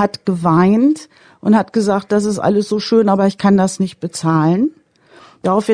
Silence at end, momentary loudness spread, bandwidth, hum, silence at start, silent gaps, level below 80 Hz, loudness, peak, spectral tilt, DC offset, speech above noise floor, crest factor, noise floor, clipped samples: 0 s; 9 LU; 10 kHz; none; 0 s; none; -54 dBFS; -15 LUFS; -2 dBFS; -6.5 dB/octave; under 0.1%; 32 dB; 14 dB; -46 dBFS; under 0.1%